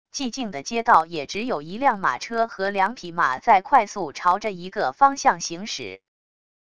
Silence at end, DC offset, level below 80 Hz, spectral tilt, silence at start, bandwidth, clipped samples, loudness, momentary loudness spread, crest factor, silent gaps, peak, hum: 0.75 s; 0.5%; -60 dBFS; -3 dB/octave; 0.15 s; 11 kHz; under 0.1%; -22 LUFS; 11 LU; 20 dB; none; -2 dBFS; none